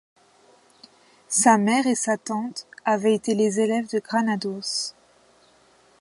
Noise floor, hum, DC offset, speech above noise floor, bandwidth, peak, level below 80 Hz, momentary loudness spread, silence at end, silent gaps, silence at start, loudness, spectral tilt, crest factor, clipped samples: -58 dBFS; none; under 0.1%; 36 dB; 11.5 kHz; -2 dBFS; -74 dBFS; 11 LU; 1.1 s; none; 1.3 s; -23 LUFS; -3.5 dB/octave; 22 dB; under 0.1%